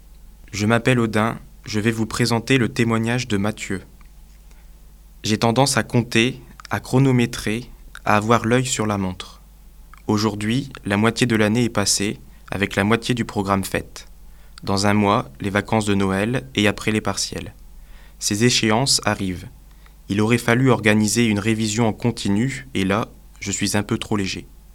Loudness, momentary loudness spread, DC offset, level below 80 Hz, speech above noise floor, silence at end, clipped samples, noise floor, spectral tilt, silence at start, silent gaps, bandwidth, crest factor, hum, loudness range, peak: -20 LUFS; 12 LU; under 0.1%; -44 dBFS; 25 dB; 0.2 s; under 0.1%; -44 dBFS; -4.5 dB/octave; 0.45 s; none; 17 kHz; 20 dB; none; 3 LU; 0 dBFS